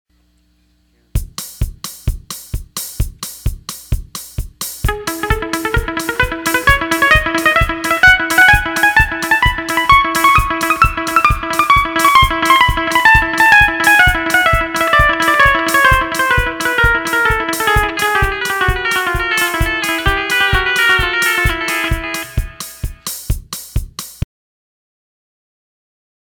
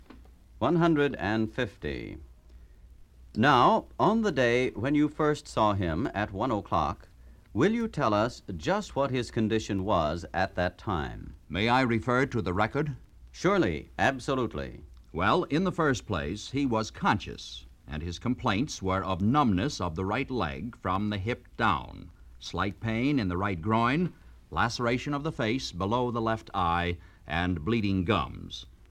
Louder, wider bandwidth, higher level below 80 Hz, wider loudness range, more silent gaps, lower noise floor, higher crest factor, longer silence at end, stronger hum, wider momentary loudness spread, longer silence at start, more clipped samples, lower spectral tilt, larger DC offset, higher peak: first, -12 LUFS vs -28 LUFS; first, 20 kHz vs 13 kHz; first, -24 dBFS vs -48 dBFS; first, 14 LU vs 4 LU; neither; first, -56 dBFS vs -52 dBFS; second, 14 dB vs 20 dB; first, 2.05 s vs 0.2 s; neither; first, 16 LU vs 12 LU; first, 1.15 s vs 0 s; first, 0.1% vs under 0.1%; second, -3 dB/octave vs -6 dB/octave; neither; first, 0 dBFS vs -8 dBFS